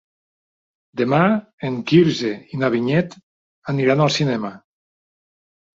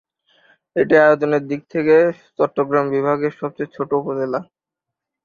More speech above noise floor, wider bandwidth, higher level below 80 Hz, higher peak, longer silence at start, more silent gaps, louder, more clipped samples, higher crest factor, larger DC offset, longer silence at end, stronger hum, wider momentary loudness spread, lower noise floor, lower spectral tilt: first, over 72 dB vs 67 dB; first, 7.8 kHz vs 7 kHz; about the same, -60 dBFS vs -62 dBFS; about the same, -2 dBFS vs -2 dBFS; first, 0.95 s vs 0.75 s; first, 1.53-1.58 s, 3.23-3.62 s vs none; about the same, -19 LUFS vs -18 LUFS; neither; about the same, 18 dB vs 18 dB; neither; first, 1.2 s vs 0.8 s; neither; about the same, 13 LU vs 13 LU; first, under -90 dBFS vs -84 dBFS; second, -6.5 dB/octave vs -8 dB/octave